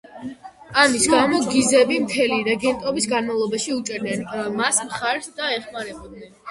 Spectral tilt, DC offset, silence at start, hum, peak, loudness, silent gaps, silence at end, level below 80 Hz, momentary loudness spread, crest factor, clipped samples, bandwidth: -2.5 dB/octave; under 0.1%; 0.1 s; none; 0 dBFS; -20 LUFS; none; 0 s; -56 dBFS; 16 LU; 20 dB; under 0.1%; 11.5 kHz